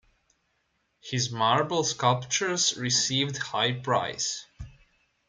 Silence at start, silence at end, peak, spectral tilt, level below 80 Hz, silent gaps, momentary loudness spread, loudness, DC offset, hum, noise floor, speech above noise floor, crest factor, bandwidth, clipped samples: 1.05 s; 0.6 s; -8 dBFS; -2.5 dB/octave; -58 dBFS; none; 8 LU; -26 LUFS; under 0.1%; none; -74 dBFS; 47 dB; 20 dB; 10 kHz; under 0.1%